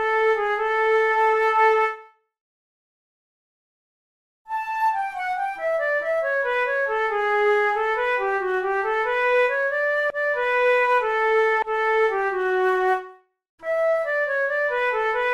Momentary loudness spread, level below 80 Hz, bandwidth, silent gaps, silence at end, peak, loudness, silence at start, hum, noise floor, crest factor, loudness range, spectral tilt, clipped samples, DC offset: 6 LU; -60 dBFS; 12.5 kHz; 2.41-4.45 s, 13.49-13.58 s; 0 s; -8 dBFS; -21 LUFS; 0 s; none; -44 dBFS; 16 dB; 7 LU; -3 dB/octave; under 0.1%; under 0.1%